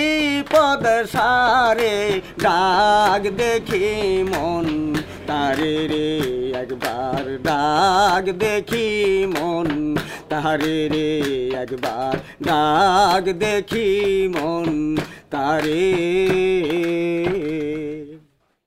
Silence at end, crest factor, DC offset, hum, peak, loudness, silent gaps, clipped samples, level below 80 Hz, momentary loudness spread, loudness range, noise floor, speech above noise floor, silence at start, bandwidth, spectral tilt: 0.5 s; 16 dB; under 0.1%; none; -4 dBFS; -19 LUFS; none; under 0.1%; -44 dBFS; 9 LU; 4 LU; -53 dBFS; 34 dB; 0 s; 16 kHz; -5 dB/octave